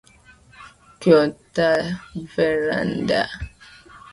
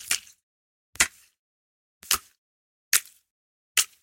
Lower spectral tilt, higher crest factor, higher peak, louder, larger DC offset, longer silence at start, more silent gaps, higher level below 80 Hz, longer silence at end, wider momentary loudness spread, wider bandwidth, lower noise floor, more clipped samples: first, -6 dB/octave vs 2 dB/octave; second, 22 dB vs 30 dB; about the same, -2 dBFS vs -2 dBFS; first, -21 LUFS vs -25 LUFS; neither; first, 0.6 s vs 0 s; second, none vs 0.43-0.93 s, 1.39-2.01 s, 2.38-2.91 s, 3.31-3.75 s; first, -48 dBFS vs -60 dBFS; about the same, 0.15 s vs 0.2 s; first, 14 LU vs 3 LU; second, 11.5 kHz vs 17 kHz; second, -51 dBFS vs under -90 dBFS; neither